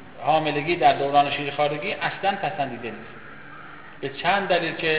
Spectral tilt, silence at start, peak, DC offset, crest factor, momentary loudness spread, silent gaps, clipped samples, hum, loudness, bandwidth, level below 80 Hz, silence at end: -8.5 dB/octave; 0 s; -6 dBFS; 0.5%; 18 dB; 21 LU; none; under 0.1%; none; -23 LUFS; 4 kHz; -58 dBFS; 0 s